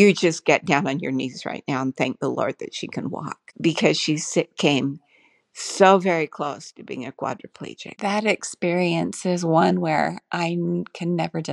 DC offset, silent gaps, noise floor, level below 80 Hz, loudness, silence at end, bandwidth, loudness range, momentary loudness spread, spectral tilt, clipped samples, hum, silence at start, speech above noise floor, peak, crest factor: under 0.1%; none; -60 dBFS; -70 dBFS; -23 LUFS; 0 s; 11.5 kHz; 4 LU; 14 LU; -5 dB/octave; under 0.1%; none; 0 s; 38 dB; -2 dBFS; 20 dB